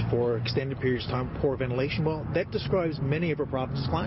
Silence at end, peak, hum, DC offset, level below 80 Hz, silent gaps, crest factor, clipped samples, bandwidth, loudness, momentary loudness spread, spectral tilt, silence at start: 0 s; -14 dBFS; none; under 0.1%; -46 dBFS; none; 14 dB; under 0.1%; 5.8 kHz; -28 LUFS; 3 LU; -10 dB/octave; 0 s